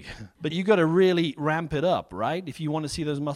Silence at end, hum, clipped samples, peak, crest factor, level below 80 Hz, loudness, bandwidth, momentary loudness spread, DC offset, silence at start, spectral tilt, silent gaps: 0 s; none; under 0.1%; -8 dBFS; 18 dB; -52 dBFS; -25 LUFS; 13 kHz; 10 LU; under 0.1%; 0 s; -6 dB/octave; none